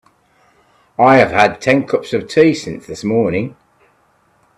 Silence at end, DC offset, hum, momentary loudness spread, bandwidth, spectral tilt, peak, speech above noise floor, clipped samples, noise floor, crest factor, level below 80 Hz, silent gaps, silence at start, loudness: 1.05 s; under 0.1%; none; 14 LU; 12 kHz; -6 dB/octave; 0 dBFS; 43 dB; under 0.1%; -56 dBFS; 16 dB; -52 dBFS; none; 1 s; -14 LUFS